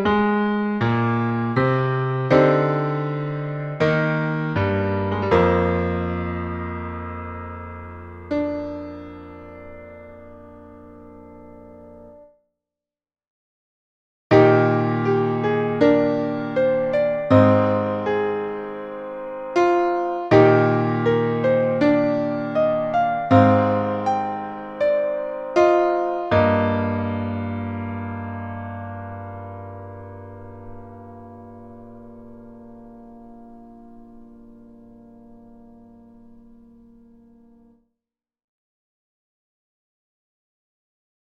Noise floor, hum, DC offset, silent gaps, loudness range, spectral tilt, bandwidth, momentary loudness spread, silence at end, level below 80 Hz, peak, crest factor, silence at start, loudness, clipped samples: -89 dBFS; none; under 0.1%; 13.27-14.30 s; 20 LU; -8.5 dB/octave; 7.8 kHz; 23 LU; 4.9 s; -50 dBFS; 0 dBFS; 22 dB; 0 s; -20 LUFS; under 0.1%